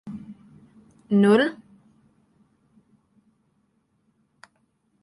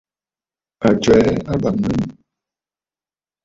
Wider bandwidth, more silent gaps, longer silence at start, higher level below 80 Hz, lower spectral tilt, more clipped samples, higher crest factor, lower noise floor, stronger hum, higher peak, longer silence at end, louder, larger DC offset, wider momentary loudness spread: first, 11.5 kHz vs 7.8 kHz; neither; second, 0.05 s vs 0.8 s; second, -68 dBFS vs -42 dBFS; about the same, -7 dB/octave vs -6.5 dB/octave; neither; about the same, 22 dB vs 18 dB; second, -69 dBFS vs under -90 dBFS; neither; second, -6 dBFS vs -2 dBFS; first, 3.5 s vs 1.35 s; second, -20 LUFS vs -17 LUFS; neither; first, 28 LU vs 9 LU